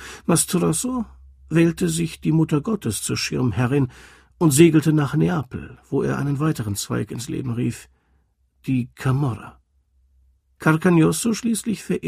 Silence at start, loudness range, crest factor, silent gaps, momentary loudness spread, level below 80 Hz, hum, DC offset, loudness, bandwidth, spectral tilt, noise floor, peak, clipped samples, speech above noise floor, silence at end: 0 s; 7 LU; 20 dB; none; 11 LU; -50 dBFS; none; under 0.1%; -21 LUFS; 15.5 kHz; -5.5 dB/octave; -63 dBFS; 0 dBFS; under 0.1%; 43 dB; 0 s